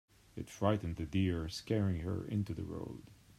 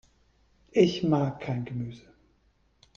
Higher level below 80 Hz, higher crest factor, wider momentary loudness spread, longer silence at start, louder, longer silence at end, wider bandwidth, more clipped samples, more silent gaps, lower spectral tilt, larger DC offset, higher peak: first, -56 dBFS vs -62 dBFS; about the same, 20 dB vs 22 dB; about the same, 14 LU vs 13 LU; second, 0.35 s vs 0.75 s; second, -37 LUFS vs -28 LUFS; second, 0.05 s vs 0.95 s; first, 13.5 kHz vs 7.4 kHz; neither; neither; about the same, -7 dB/octave vs -7 dB/octave; neither; second, -18 dBFS vs -8 dBFS